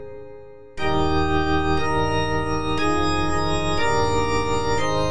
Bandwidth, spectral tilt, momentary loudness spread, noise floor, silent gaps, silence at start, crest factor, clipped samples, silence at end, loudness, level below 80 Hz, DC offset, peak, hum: 10.5 kHz; -5.5 dB/octave; 5 LU; -42 dBFS; none; 0 s; 14 dB; under 0.1%; 0 s; -22 LUFS; -34 dBFS; 5%; -8 dBFS; none